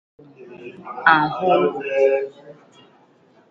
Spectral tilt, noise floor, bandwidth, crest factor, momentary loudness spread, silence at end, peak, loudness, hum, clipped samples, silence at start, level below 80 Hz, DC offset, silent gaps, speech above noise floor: -6.5 dB/octave; -55 dBFS; 7.2 kHz; 22 dB; 22 LU; 1 s; 0 dBFS; -18 LUFS; none; under 0.1%; 0.4 s; -64 dBFS; under 0.1%; none; 36 dB